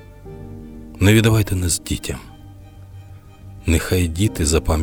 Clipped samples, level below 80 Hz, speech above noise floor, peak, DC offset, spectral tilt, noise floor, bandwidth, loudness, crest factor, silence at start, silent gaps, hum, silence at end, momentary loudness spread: under 0.1%; -32 dBFS; 23 dB; -4 dBFS; under 0.1%; -5 dB/octave; -40 dBFS; 18.5 kHz; -18 LUFS; 16 dB; 0 s; none; none; 0 s; 24 LU